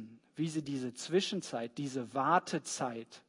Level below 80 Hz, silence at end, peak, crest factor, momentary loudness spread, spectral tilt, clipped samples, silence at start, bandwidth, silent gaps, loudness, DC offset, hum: -82 dBFS; 0.1 s; -14 dBFS; 22 dB; 9 LU; -4.5 dB/octave; under 0.1%; 0 s; 11 kHz; none; -35 LUFS; under 0.1%; none